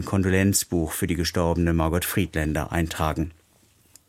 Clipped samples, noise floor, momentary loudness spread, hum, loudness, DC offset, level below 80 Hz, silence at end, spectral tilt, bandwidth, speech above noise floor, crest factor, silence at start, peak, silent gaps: under 0.1%; -60 dBFS; 6 LU; none; -24 LUFS; under 0.1%; -38 dBFS; 0.75 s; -5 dB/octave; 16.5 kHz; 36 dB; 18 dB; 0 s; -6 dBFS; none